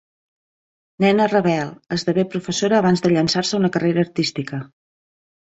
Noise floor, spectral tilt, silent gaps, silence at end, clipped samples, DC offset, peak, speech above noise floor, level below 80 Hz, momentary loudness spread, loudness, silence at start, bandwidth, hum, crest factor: under -90 dBFS; -5.5 dB/octave; none; 0.85 s; under 0.1%; under 0.1%; -4 dBFS; over 71 dB; -58 dBFS; 8 LU; -19 LUFS; 1 s; 8 kHz; none; 16 dB